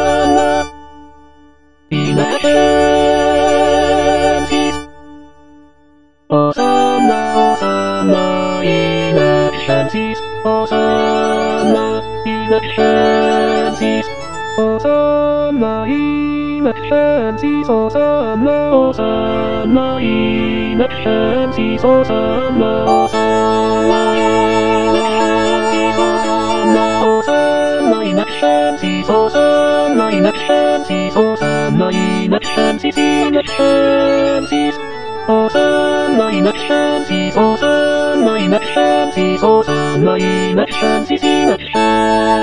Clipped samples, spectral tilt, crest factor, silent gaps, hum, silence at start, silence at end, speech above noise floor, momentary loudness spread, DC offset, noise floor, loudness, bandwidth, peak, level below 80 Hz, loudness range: under 0.1%; -5.5 dB/octave; 14 dB; none; none; 0 s; 0 s; 37 dB; 5 LU; 2%; -49 dBFS; -13 LUFS; 10 kHz; 0 dBFS; -40 dBFS; 2 LU